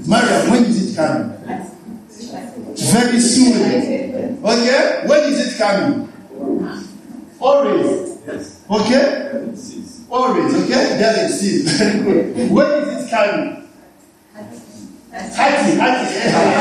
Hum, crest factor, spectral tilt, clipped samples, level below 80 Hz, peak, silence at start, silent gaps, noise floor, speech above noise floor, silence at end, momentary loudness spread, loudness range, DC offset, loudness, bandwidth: none; 16 dB; -4.5 dB/octave; under 0.1%; -54 dBFS; 0 dBFS; 0 s; none; -47 dBFS; 32 dB; 0 s; 19 LU; 4 LU; under 0.1%; -15 LUFS; 13 kHz